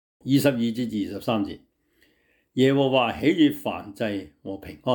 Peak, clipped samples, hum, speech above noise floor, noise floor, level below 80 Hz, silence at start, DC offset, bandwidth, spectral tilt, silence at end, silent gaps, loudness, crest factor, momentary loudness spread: -8 dBFS; under 0.1%; none; 42 dB; -66 dBFS; -60 dBFS; 0.25 s; under 0.1%; 19.5 kHz; -6 dB/octave; 0 s; none; -24 LUFS; 16 dB; 14 LU